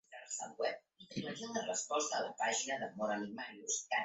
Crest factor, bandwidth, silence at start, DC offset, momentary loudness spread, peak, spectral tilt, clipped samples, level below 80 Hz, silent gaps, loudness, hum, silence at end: 18 dB; 8.2 kHz; 0.1 s; under 0.1%; 9 LU; -22 dBFS; -2 dB/octave; under 0.1%; -82 dBFS; none; -39 LUFS; none; 0 s